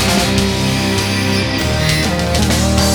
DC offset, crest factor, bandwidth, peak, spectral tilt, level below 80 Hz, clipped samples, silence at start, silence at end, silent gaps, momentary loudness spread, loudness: under 0.1%; 14 dB; over 20 kHz; 0 dBFS; -4 dB/octave; -24 dBFS; under 0.1%; 0 s; 0 s; none; 2 LU; -14 LUFS